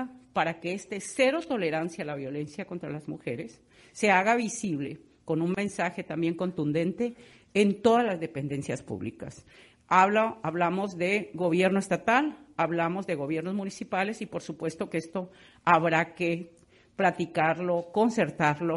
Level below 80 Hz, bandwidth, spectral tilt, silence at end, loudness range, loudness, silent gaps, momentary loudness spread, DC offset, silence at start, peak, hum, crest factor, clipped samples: -68 dBFS; 11.5 kHz; -5.5 dB/octave; 0 s; 4 LU; -28 LUFS; none; 13 LU; under 0.1%; 0 s; -6 dBFS; none; 22 dB; under 0.1%